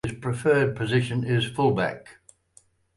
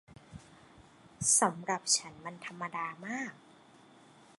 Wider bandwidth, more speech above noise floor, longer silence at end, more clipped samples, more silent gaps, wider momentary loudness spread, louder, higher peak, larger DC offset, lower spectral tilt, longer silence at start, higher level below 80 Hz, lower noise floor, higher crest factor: about the same, 11.5 kHz vs 12 kHz; first, 36 dB vs 26 dB; second, 0.85 s vs 1.05 s; neither; neither; second, 8 LU vs 27 LU; first, -24 LUFS vs -31 LUFS; first, -10 dBFS vs -14 dBFS; neither; first, -6.5 dB/octave vs -1.5 dB/octave; about the same, 0.05 s vs 0.1 s; first, -54 dBFS vs -70 dBFS; about the same, -60 dBFS vs -59 dBFS; second, 16 dB vs 24 dB